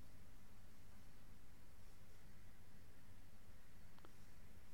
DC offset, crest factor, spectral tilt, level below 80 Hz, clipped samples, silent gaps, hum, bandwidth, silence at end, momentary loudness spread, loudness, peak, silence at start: 0.3%; 20 dB; -5 dB/octave; -66 dBFS; under 0.1%; none; 50 Hz at -80 dBFS; 16.5 kHz; 0 s; 1 LU; -67 LUFS; -44 dBFS; 0 s